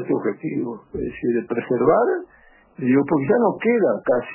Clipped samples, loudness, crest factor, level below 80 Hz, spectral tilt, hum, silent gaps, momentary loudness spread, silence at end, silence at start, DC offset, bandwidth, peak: under 0.1%; -21 LUFS; 16 dB; -52 dBFS; -12 dB/octave; none; none; 10 LU; 0 s; 0 s; under 0.1%; 3.1 kHz; -4 dBFS